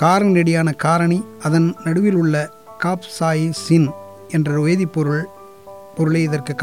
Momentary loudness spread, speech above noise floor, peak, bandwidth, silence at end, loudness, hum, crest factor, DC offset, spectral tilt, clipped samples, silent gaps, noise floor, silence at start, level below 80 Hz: 8 LU; 22 dB; -4 dBFS; 13.5 kHz; 0 s; -18 LUFS; none; 14 dB; 0.3%; -7 dB/octave; under 0.1%; none; -39 dBFS; 0 s; -62 dBFS